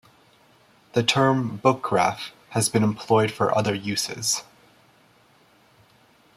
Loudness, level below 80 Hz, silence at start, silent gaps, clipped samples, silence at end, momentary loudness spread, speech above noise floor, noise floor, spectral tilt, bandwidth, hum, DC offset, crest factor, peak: -23 LUFS; -64 dBFS; 0.95 s; none; under 0.1%; 1.95 s; 6 LU; 35 dB; -58 dBFS; -4 dB/octave; 16 kHz; none; under 0.1%; 22 dB; -4 dBFS